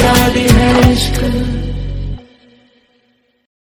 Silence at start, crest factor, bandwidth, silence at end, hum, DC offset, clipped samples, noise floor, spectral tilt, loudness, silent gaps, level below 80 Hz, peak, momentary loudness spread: 0 s; 14 dB; over 20 kHz; 1.55 s; none; under 0.1%; 0.2%; -58 dBFS; -5 dB/octave; -12 LUFS; none; -22 dBFS; 0 dBFS; 15 LU